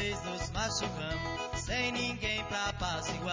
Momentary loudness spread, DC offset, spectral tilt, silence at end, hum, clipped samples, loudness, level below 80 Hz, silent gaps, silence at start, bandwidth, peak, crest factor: 4 LU; under 0.1%; -3.5 dB/octave; 0 s; none; under 0.1%; -34 LUFS; -46 dBFS; none; 0 s; 7.8 kHz; -20 dBFS; 14 dB